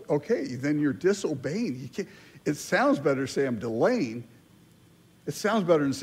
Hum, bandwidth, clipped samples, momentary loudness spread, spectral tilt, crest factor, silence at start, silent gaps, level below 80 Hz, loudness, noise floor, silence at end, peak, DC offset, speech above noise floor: none; 16 kHz; under 0.1%; 13 LU; -5.5 dB/octave; 18 dB; 0 s; none; -68 dBFS; -27 LUFS; -57 dBFS; 0 s; -10 dBFS; under 0.1%; 31 dB